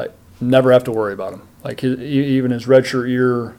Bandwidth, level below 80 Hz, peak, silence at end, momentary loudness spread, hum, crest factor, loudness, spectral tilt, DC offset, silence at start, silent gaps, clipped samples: 15.5 kHz; -54 dBFS; -2 dBFS; 0.05 s; 16 LU; none; 16 dB; -16 LUFS; -7 dB/octave; under 0.1%; 0 s; none; under 0.1%